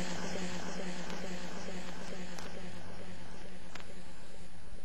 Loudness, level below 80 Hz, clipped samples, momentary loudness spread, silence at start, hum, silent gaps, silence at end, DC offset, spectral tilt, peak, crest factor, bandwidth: -44 LUFS; -58 dBFS; under 0.1%; 13 LU; 0 s; none; none; 0 s; 3%; -4 dB/octave; -20 dBFS; 22 dB; 16 kHz